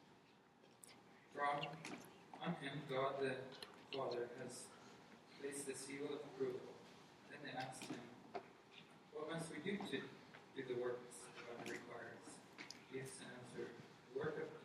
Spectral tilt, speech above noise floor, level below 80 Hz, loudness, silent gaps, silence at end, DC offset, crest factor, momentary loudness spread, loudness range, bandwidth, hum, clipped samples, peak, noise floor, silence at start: -4.5 dB/octave; 23 dB; -88 dBFS; -49 LUFS; none; 0 s; under 0.1%; 20 dB; 17 LU; 5 LU; 13 kHz; none; under 0.1%; -30 dBFS; -69 dBFS; 0 s